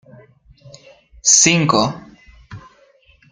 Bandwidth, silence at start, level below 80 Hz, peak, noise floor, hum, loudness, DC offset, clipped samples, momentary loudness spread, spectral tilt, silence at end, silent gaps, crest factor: 10.5 kHz; 1.25 s; -50 dBFS; 0 dBFS; -53 dBFS; none; -13 LUFS; under 0.1%; under 0.1%; 13 LU; -2.5 dB/octave; 0.75 s; none; 20 dB